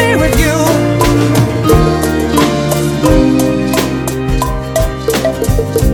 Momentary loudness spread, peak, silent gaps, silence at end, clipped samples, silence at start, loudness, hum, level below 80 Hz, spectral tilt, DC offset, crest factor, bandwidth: 5 LU; 0 dBFS; none; 0 s; 0.3%; 0 s; -12 LUFS; none; -20 dBFS; -5.5 dB/octave; under 0.1%; 10 dB; 19.5 kHz